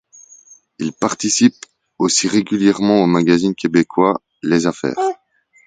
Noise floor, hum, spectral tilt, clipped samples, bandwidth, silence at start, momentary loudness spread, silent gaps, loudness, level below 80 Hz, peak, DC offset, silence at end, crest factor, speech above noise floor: -46 dBFS; none; -4.5 dB/octave; under 0.1%; 9.4 kHz; 0.8 s; 8 LU; none; -16 LUFS; -56 dBFS; 0 dBFS; under 0.1%; 0.5 s; 16 dB; 31 dB